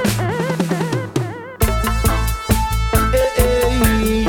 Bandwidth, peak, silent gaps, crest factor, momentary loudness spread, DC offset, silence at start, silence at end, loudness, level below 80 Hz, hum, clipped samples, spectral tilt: over 20 kHz; 0 dBFS; none; 16 dB; 5 LU; under 0.1%; 0 s; 0 s; -18 LUFS; -22 dBFS; none; under 0.1%; -5 dB/octave